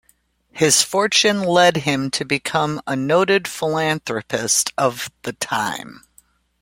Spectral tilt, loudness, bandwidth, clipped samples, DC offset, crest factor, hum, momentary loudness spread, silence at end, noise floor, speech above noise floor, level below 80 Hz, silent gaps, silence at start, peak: -2.5 dB/octave; -18 LUFS; 16.5 kHz; under 0.1%; under 0.1%; 18 dB; none; 10 LU; 0.7 s; -61 dBFS; 42 dB; -58 dBFS; none; 0.55 s; -2 dBFS